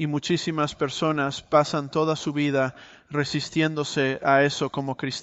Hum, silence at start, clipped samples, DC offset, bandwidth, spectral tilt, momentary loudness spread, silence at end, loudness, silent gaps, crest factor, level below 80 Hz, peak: none; 0 s; under 0.1%; under 0.1%; 8.2 kHz; -5 dB/octave; 8 LU; 0 s; -24 LUFS; none; 18 dB; -60 dBFS; -6 dBFS